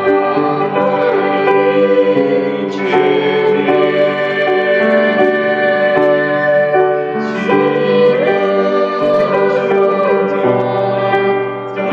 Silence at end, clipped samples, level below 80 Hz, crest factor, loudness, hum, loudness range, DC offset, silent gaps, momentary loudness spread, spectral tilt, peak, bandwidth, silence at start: 0 s; under 0.1%; -60 dBFS; 12 dB; -13 LUFS; none; 1 LU; under 0.1%; none; 4 LU; -7.5 dB/octave; 0 dBFS; 7 kHz; 0 s